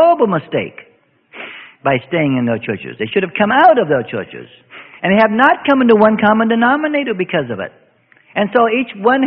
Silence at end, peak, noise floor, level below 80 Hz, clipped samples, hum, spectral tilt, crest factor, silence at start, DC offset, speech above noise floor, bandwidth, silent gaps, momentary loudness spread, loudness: 0 s; 0 dBFS; -51 dBFS; -56 dBFS; under 0.1%; none; -9 dB/octave; 14 dB; 0 s; under 0.1%; 37 dB; 5.6 kHz; none; 16 LU; -14 LUFS